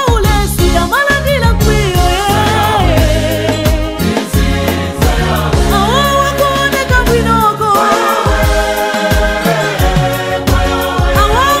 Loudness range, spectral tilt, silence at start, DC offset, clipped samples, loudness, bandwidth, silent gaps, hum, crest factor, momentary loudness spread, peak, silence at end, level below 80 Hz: 2 LU; -5 dB/octave; 0 s; 0.3%; under 0.1%; -11 LUFS; 16.5 kHz; none; none; 10 dB; 3 LU; 0 dBFS; 0 s; -18 dBFS